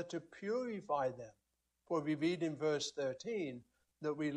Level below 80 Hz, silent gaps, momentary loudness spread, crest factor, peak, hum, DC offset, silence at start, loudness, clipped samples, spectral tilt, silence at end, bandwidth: -80 dBFS; none; 9 LU; 16 dB; -24 dBFS; none; under 0.1%; 0 s; -39 LUFS; under 0.1%; -5 dB/octave; 0 s; 10 kHz